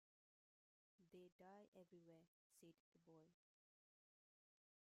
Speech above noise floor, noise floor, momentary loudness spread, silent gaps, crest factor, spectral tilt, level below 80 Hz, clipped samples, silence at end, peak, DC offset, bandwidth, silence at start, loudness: over 20 dB; under -90 dBFS; 2 LU; 1.32-1.39 s, 1.68-1.72 s, 2.28-2.50 s, 2.80-2.92 s; 16 dB; -6 dB/octave; under -90 dBFS; under 0.1%; 1.6 s; -56 dBFS; under 0.1%; 7.4 kHz; 1 s; -68 LUFS